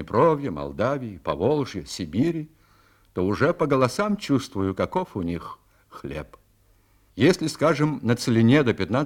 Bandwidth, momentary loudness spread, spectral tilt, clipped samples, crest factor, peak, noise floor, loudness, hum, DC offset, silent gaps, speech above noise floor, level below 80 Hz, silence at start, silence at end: 17 kHz; 15 LU; -6.5 dB/octave; under 0.1%; 20 dB; -4 dBFS; -60 dBFS; -23 LUFS; none; under 0.1%; none; 37 dB; -52 dBFS; 0 s; 0 s